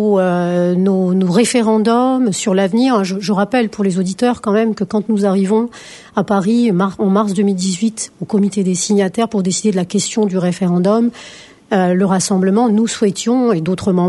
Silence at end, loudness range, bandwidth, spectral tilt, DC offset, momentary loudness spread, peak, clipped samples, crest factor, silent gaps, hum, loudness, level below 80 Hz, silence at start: 0 s; 2 LU; 11.5 kHz; -5.5 dB/octave; under 0.1%; 4 LU; -2 dBFS; under 0.1%; 14 dB; none; none; -15 LUFS; -56 dBFS; 0 s